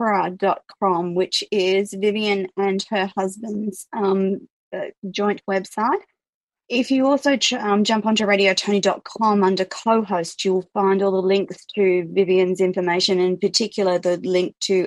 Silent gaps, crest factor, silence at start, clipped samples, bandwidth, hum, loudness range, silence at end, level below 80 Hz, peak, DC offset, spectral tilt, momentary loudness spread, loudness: 4.50-4.71 s, 4.98-5.02 s, 6.29-6.49 s; 16 dB; 0 s; under 0.1%; 12 kHz; none; 5 LU; 0 s; -70 dBFS; -4 dBFS; under 0.1%; -4.5 dB/octave; 7 LU; -20 LUFS